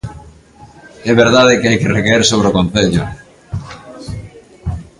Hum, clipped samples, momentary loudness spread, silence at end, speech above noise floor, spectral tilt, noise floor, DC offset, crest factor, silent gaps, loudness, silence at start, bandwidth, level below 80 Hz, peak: none; under 0.1%; 20 LU; 0.15 s; 29 dB; -4.5 dB/octave; -41 dBFS; under 0.1%; 14 dB; none; -12 LUFS; 0.05 s; 11.5 kHz; -34 dBFS; 0 dBFS